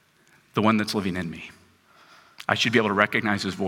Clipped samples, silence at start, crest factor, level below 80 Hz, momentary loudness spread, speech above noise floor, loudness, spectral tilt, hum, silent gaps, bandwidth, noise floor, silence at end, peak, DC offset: under 0.1%; 0.55 s; 24 dB; -64 dBFS; 14 LU; 36 dB; -23 LUFS; -5 dB/octave; none; none; 16.5 kHz; -60 dBFS; 0 s; -2 dBFS; under 0.1%